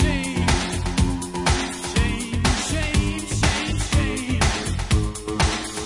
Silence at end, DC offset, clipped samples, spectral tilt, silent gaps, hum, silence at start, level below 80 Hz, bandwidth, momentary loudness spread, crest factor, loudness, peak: 0 s; under 0.1%; under 0.1%; -4 dB/octave; none; none; 0 s; -28 dBFS; 11.5 kHz; 3 LU; 16 dB; -22 LUFS; -6 dBFS